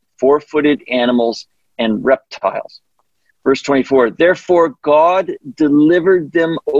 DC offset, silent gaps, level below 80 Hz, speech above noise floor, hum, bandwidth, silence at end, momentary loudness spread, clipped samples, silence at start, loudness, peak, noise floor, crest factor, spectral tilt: under 0.1%; none; -54 dBFS; 50 dB; none; 7.6 kHz; 0 s; 9 LU; under 0.1%; 0.2 s; -14 LUFS; -2 dBFS; -64 dBFS; 12 dB; -6 dB/octave